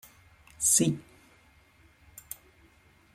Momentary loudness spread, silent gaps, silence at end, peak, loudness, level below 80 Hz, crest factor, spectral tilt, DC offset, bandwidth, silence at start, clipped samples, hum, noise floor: 22 LU; none; 2.15 s; -8 dBFS; -25 LUFS; -64 dBFS; 24 dB; -3.5 dB/octave; under 0.1%; 16.5 kHz; 0.6 s; under 0.1%; none; -61 dBFS